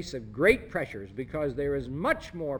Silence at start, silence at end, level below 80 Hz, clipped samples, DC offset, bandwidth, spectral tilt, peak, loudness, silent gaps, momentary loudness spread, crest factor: 0 s; 0 s; -48 dBFS; under 0.1%; under 0.1%; 19.5 kHz; -6 dB/octave; -8 dBFS; -29 LUFS; none; 13 LU; 20 dB